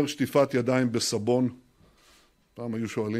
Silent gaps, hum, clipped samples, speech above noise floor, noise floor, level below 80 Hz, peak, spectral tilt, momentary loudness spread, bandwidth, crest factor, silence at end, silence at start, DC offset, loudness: none; none; under 0.1%; 35 dB; -61 dBFS; -66 dBFS; -10 dBFS; -5 dB/octave; 9 LU; 16 kHz; 18 dB; 0 s; 0 s; under 0.1%; -26 LUFS